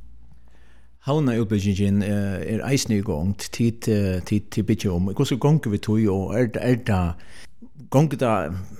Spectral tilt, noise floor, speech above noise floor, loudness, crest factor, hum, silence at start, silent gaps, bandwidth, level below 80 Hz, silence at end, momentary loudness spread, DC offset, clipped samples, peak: -6.5 dB/octave; -52 dBFS; 30 dB; -23 LUFS; 18 dB; none; 0 s; none; 15.5 kHz; -48 dBFS; 0 s; 5 LU; 1%; under 0.1%; -6 dBFS